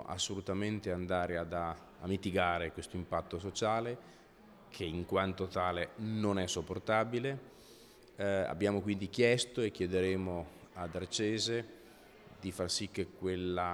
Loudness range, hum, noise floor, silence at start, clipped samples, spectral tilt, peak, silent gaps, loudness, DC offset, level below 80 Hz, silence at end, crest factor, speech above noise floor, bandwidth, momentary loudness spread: 3 LU; none; -59 dBFS; 0 s; under 0.1%; -4.5 dB/octave; -14 dBFS; none; -36 LUFS; under 0.1%; -66 dBFS; 0 s; 22 dB; 23 dB; over 20 kHz; 10 LU